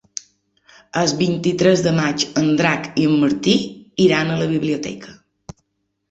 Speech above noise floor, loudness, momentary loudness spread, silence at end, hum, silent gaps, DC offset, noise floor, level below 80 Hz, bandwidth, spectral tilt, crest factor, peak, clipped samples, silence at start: 55 dB; -18 LUFS; 12 LU; 1 s; none; none; under 0.1%; -72 dBFS; -54 dBFS; 8.2 kHz; -5 dB/octave; 18 dB; -2 dBFS; under 0.1%; 0.95 s